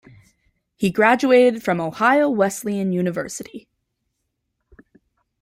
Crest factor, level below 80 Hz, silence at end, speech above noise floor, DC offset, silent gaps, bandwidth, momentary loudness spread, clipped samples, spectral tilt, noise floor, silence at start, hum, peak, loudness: 18 dB; -60 dBFS; 1.85 s; 57 dB; under 0.1%; none; 16 kHz; 14 LU; under 0.1%; -5.5 dB/octave; -76 dBFS; 0.8 s; none; -2 dBFS; -18 LUFS